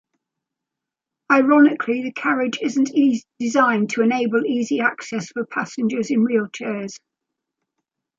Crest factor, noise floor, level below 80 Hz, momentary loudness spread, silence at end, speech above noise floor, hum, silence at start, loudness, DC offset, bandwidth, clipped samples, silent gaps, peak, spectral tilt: 18 dB; -85 dBFS; -72 dBFS; 12 LU; 1.2 s; 66 dB; none; 1.3 s; -20 LUFS; under 0.1%; 7.8 kHz; under 0.1%; none; -2 dBFS; -5 dB/octave